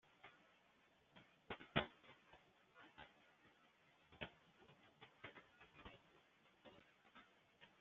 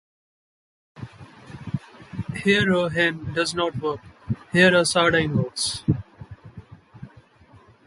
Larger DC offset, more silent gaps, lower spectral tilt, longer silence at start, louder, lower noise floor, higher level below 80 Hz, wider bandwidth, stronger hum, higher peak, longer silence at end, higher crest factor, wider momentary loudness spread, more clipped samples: neither; neither; second, -2.5 dB/octave vs -4.5 dB/octave; second, 0.05 s vs 0.95 s; second, -52 LUFS vs -22 LUFS; first, -76 dBFS vs -52 dBFS; second, -78 dBFS vs -50 dBFS; second, 7.2 kHz vs 11.5 kHz; neither; second, -24 dBFS vs -4 dBFS; second, 0 s vs 0.8 s; first, 34 dB vs 20 dB; about the same, 24 LU vs 25 LU; neither